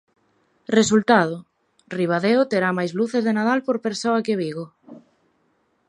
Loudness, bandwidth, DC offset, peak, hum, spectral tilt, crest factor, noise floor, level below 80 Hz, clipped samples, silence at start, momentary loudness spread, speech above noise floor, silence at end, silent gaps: -21 LUFS; 11 kHz; under 0.1%; -2 dBFS; none; -5 dB/octave; 20 dB; -66 dBFS; -64 dBFS; under 0.1%; 0.7 s; 15 LU; 46 dB; 0.9 s; none